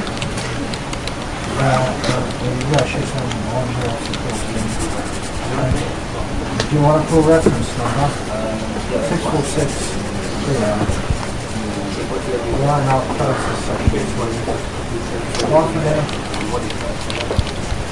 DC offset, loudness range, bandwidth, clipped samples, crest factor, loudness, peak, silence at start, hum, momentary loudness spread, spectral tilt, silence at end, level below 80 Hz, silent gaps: 2%; 4 LU; 11.5 kHz; under 0.1%; 16 dB; -19 LUFS; -2 dBFS; 0 s; none; 8 LU; -5.5 dB/octave; 0 s; -30 dBFS; none